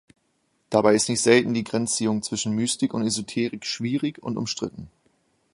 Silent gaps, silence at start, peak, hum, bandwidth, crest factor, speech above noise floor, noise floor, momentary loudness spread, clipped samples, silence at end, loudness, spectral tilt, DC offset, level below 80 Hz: none; 0.7 s; -2 dBFS; none; 11.5 kHz; 22 dB; 47 dB; -70 dBFS; 10 LU; under 0.1%; 0.65 s; -23 LUFS; -4 dB/octave; under 0.1%; -60 dBFS